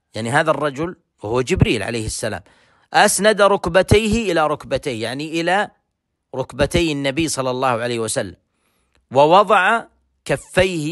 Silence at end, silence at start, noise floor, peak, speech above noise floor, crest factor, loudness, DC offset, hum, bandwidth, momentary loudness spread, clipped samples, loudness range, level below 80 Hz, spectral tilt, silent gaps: 0 s; 0.15 s; -74 dBFS; 0 dBFS; 56 dB; 18 dB; -18 LUFS; under 0.1%; none; 12.5 kHz; 14 LU; under 0.1%; 4 LU; -38 dBFS; -4.5 dB/octave; none